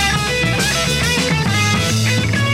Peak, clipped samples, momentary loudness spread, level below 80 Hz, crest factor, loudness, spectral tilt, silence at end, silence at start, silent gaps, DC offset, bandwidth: -4 dBFS; under 0.1%; 1 LU; -32 dBFS; 12 dB; -15 LUFS; -3.5 dB/octave; 0 s; 0 s; none; under 0.1%; 16 kHz